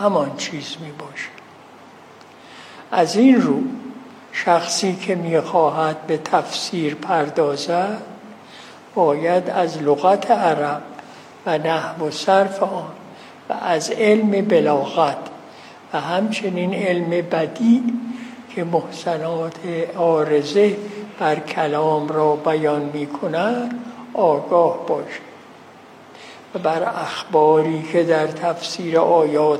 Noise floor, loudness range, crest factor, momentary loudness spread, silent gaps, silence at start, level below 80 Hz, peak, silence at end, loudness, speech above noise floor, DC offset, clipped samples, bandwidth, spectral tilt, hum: -44 dBFS; 3 LU; 18 dB; 17 LU; none; 0 s; -74 dBFS; -2 dBFS; 0 s; -19 LUFS; 25 dB; under 0.1%; under 0.1%; 13 kHz; -5.5 dB/octave; none